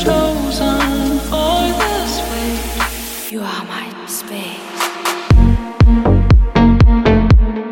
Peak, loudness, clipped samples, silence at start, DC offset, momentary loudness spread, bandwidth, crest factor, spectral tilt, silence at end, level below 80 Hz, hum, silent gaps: 0 dBFS; -15 LUFS; under 0.1%; 0 s; under 0.1%; 13 LU; 17 kHz; 12 dB; -6 dB/octave; 0 s; -16 dBFS; none; none